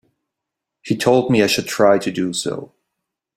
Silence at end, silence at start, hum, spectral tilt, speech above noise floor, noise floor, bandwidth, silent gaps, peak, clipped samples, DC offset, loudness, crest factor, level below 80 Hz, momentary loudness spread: 0.7 s; 0.85 s; none; -4.5 dB/octave; 65 dB; -82 dBFS; 16.5 kHz; none; -2 dBFS; under 0.1%; under 0.1%; -17 LUFS; 18 dB; -56 dBFS; 10 LU